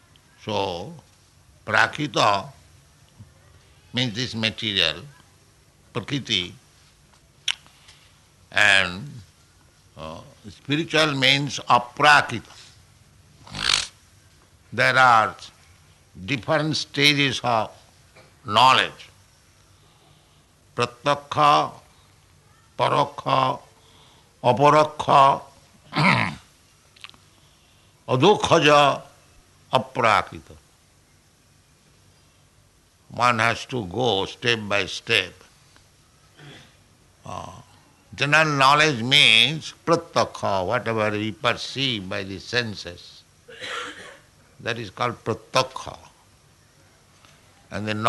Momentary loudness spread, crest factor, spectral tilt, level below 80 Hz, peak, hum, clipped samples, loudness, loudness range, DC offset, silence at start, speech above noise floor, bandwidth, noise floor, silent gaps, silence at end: 21 LU; 20 dB; -3.5 dB/octave; -58 dBFS; -4 dBFS; none; under 0.1%; -20 LUFS; 10 LU; under 0.1%; 0.45 s; 37 dB; 12 kHz; -58 dBFS; none; 0 s